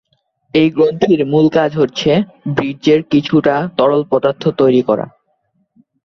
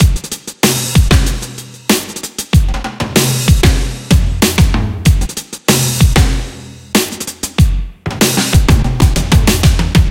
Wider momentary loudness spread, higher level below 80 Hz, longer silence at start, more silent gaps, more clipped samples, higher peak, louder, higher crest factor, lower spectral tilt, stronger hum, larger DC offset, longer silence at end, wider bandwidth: second, 6 LU vs 11 LU; second, -52 dBFS vs -16 dBFS; first, 0.55 s vs 0 s; neither; neither; about the same, -2 dBFS vs 0 dBFS; about the same, -14 LUFS vs -13 LUFS; about the same, 12 dB vs 12 dB; first, -7 dB/octave vs -4.5 dB/octave; neither; neither; first, 0.95 s vs 0 s; second, 7 kHz vs 17.5 kHz